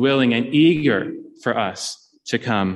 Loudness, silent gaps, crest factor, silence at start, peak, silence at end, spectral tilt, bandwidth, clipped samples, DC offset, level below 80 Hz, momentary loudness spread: -20 LUFS; none; 16 dB; 0 s; -4 dBFS; 0 s; -5.5 dB/octave; 12 kHz; under 0.1%; under 0.1%; -62 dBFS; 14 LU